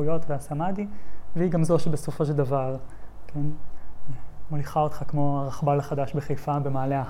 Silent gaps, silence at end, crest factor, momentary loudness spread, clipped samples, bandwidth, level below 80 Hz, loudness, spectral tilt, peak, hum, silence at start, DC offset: none; 0 s; 14 dB; 18 LU; under 0.1%; 14 kHz; -46 dBFS; -27 LUFS; -8 dB/octave; -10 dBFS; none; 0 s; under 0.1%